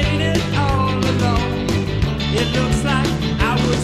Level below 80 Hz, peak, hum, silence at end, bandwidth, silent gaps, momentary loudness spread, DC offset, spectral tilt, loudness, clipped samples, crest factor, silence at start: -28 dBFS; -4 dBFS; none; 0 s; 15 kHz; none; 3 LU; under 0.1%; -5.5 dB/octave; -18 LUFS; under 0.1%; 14 dB; 0 s